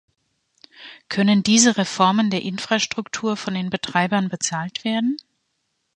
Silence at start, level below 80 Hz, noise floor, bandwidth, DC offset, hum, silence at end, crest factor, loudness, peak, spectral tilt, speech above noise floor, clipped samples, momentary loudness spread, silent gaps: 0.8 s; -64 dBFS; -73 dBFS; 10 kHz; under 0.1%; none; 0.8 s; 20 dB; -20 LUFS; 0 dBFS; -3.5 dB/octave; 52 dB; under 0.1%; 10 LU; none